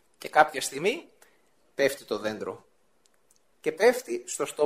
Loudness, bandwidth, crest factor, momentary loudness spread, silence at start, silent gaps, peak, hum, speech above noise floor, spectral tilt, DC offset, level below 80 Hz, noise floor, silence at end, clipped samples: -27 LUFS; 16 kHz; 24 dB; 14 LU; 0.2 s; none; -4 dBFS; none; 42 dB; -2.5 dB/octave; under 0.1%; -74 dBFS; -68 dBFS; 0 s; under 0.1%